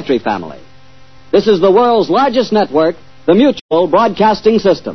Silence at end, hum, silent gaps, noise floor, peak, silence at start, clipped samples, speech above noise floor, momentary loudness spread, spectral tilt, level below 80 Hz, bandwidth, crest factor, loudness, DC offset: 0 s; none; 3.61-3.69 s; -43 dBFS; 0 dBFS; 0 s; under 0.1%; 32 dB; 7 LU; -6.5 dB/octave; -46 dBFS; 6.4 kHz; 12 dB; -12 LUFS; 1%